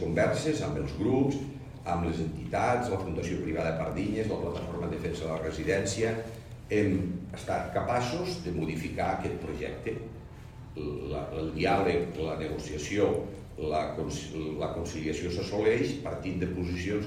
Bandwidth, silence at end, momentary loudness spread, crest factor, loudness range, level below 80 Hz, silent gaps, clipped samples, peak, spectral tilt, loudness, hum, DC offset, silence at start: 15.5 kHz; 0 s; 10 LU; 18 dB; 2 LU; -48 dBFS; none; under 0.1%; -14 dBFS; -6 dB/octave; -31 LUFS; none; under 0.1%; 0 s